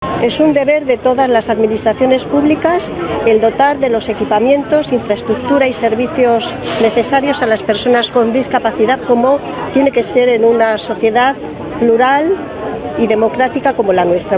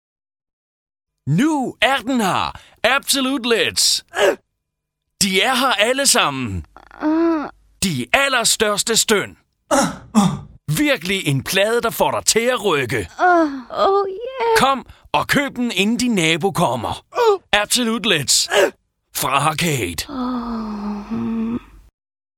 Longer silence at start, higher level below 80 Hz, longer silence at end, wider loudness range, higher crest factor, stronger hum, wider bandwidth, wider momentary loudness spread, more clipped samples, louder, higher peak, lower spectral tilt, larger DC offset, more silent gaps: second, 0 s vs 1.25 s; first, -42 dBFS vs -48 dBFS; second, 0 s vs 0.8 s; about the same, 1 LU vs 2 LU; second, 12 dB vs 18 dB; neither; second, 4 kHz vs 19 kHz; second, 5 LU vs 10 LU; neither; first, -13 LUFS vs -18 LUFS; about the same, 0 dBFS vs 0 dBFS; first, -9.5 dB/octave vs -3 dB/octave; neither; neither